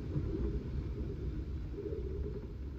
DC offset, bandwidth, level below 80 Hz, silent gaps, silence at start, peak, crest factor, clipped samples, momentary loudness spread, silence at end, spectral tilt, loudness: under 0.1%; 6.6 kHz; -40 dBFS; none; 0 s; -22 dBFS; 16 dB; under 0.1%; 5 LU; 0 s; -10 dB/octave; -40 LUFS